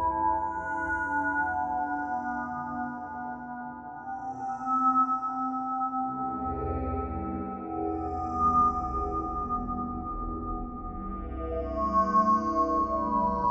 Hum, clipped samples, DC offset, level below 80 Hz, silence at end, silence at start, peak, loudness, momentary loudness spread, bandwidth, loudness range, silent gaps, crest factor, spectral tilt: none; under 0.1%; under 0.1%; -44 dBFS; 0 s; 0 s; -14 dBFS; -30 LUFS; 13 LU; 8.4 kHz; 4 LU; none; 16 dB; -8.5 dB/octave